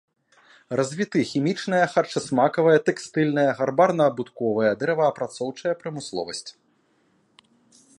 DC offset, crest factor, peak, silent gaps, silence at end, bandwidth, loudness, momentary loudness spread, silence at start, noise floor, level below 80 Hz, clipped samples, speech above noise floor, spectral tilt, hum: under 0.1%; 20 dB; -4 dBFS; none; 1.45 s; 11.5 kHz; -23 LUFS; 11 LU; 0.7 s; -65 dBFS; -70 dBFS; under 0.1%; 42 dB; -5.5 dB/octave; none